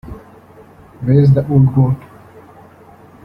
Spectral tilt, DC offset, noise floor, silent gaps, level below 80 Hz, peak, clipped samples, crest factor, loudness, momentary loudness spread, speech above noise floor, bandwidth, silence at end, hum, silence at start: -11.5 dB/octave; under 0.1%; -42 dBFS; none; -42 dBFS; -2 dBFS; under 0.1%; 14 dB; -13 LUFS; 20 LU; 31 dB; 5.2 kHz; 1.25 s; none; 0.05 s